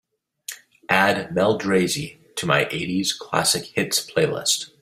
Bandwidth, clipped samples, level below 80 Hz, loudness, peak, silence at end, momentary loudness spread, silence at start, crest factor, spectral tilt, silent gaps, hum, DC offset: 16 kHz; under 0.1%; -60 dBFS; -21 LUFS; -2 dBFS; 0.15 s; 16 LU; 0.5 s; 22 dB; -3 dB/octave; none; none; under 0.1%